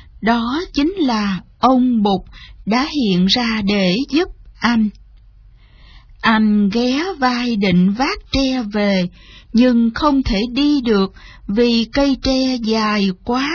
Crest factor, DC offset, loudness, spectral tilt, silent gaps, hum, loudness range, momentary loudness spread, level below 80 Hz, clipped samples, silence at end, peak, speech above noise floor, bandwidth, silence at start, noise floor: 16 dB; under 0.1%; -16 LUFS; -6 dB/octave; none; none; 2 LU; 6 LU; -36 dBFS; under 0.1%; 0 s; 0 dBFS; 29 dB; 5.4 kHz; 0.2 s; -45 dBFS